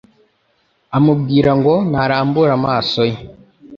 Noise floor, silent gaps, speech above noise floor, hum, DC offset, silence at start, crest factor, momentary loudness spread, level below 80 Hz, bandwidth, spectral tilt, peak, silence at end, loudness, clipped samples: -61 dBFS; none; 47 dB; none; under 0.1%; 0.9 s; 14 dB; 6 LU; -46 dBFS; 7.2 kHz; -8 dB/octave; -2 dBFS; 0 s; -15 LUFS; under 0.1%